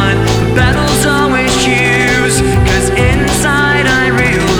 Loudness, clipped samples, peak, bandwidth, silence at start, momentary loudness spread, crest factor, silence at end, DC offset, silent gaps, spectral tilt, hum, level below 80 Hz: -10 LUFS; under 0.1%; 0 dBFS; over 20 kHz; 0 s; 2 LU; 10 dB; 0 s; under 0.1%; none; -4.5 dB/octave; none; -20 dBFS